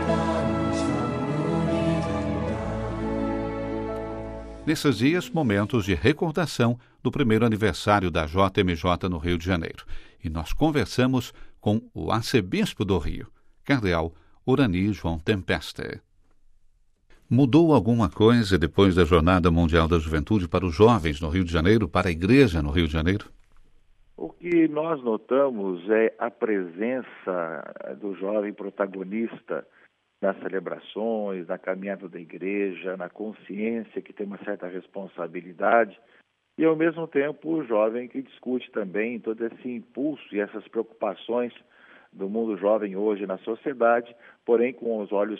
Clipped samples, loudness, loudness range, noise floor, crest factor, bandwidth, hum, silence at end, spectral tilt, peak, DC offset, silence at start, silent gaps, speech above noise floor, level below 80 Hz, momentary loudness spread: under 0.1%; -25 LUFS; 10 LU; -59 dBFS; 20 dB; 13.5 kHz; none; 0 s; -7 dB/octave; -6 dBFS; under 0.1%; 0 s; none; 35 dB; -42 dBFS; 14 LU